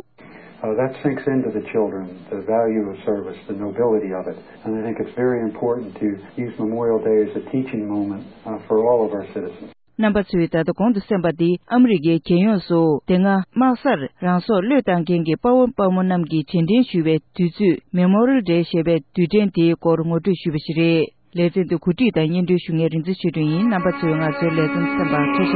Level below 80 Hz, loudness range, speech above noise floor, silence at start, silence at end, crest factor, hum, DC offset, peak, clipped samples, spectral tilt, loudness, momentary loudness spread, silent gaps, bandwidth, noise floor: -52 dBFS; 5 LU; 25 dB; 0.3 s; 0 s; 14 dB; none; 0.1%; -4 dBFS; under 0.1%; -12.5 dB/octave; -19 LUFS; 9 LU; none; 4.8 kHz; -44 dBFS